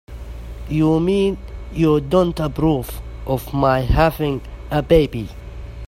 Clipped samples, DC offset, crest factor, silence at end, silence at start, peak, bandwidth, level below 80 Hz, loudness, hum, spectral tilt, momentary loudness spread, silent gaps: under 0.1%; under 0.1%; 18 dB; 0 s; 0.1 s; 0 dBFS; 16 kHz; -30 dBFS; -19 LUFS; none; -7.5 dB/octave; 17 LU; none